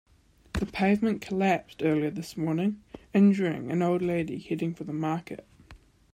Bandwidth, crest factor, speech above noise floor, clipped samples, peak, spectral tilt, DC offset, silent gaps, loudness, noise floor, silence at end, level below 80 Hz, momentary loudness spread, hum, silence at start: 13.5 kHz; 16 dB; 27 dB; under 0.1%; -12 dBFS; -7.5 dB/octave; under 0.1%; none; -28 LUFS; -54 dBFS; 0.35 s; -52 dBFS; 11 LU; none; 0.55 s